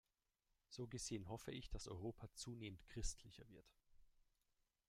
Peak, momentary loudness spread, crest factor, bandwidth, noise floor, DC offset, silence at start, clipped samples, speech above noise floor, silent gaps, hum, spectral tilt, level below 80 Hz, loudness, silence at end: -32 dBFS; 14 LU; 22 dB; 16 kHz; -89 dBFS; under 0.1%; 0.7 s; under 0.1%; 37 dB; none; none; -4 dB/octave; -60 dBFS; -53 LUFS; 0.8 s